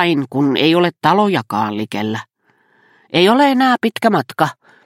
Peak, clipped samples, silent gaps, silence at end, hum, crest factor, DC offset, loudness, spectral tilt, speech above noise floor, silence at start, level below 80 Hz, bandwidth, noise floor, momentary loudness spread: 0 dBFS; under 0.1%; none; 0.35 s; none; 16 dB; under 0.1%; -15 LUFS; -6 dB/octave; 42 dB; 0 s; -62 dBFS; 16 kHz; -57 dBFS; 9 LU